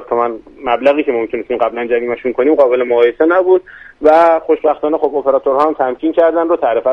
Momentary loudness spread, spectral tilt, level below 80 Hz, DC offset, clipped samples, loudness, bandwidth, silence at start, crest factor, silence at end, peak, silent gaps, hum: 6 LU; -6.5 dB/octave; -50 dBFS; under 0.1%; under 0.1%; -13 LUFS; 5.8 kHz; 0 s; 12 dB; 0 s; 0 dBFS; none; none